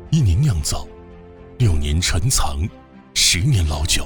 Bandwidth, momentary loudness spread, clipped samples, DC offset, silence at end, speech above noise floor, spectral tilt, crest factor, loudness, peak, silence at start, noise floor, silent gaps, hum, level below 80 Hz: over 20 kHz; 12 LU; under 0.1%; under 0.1%; 0 s; 23 dB; -3.5 dB/octave; 14 dB; -19 LUFS; -4 dBFS; 0 s; -40 dBFS; none; none; -28 dBFS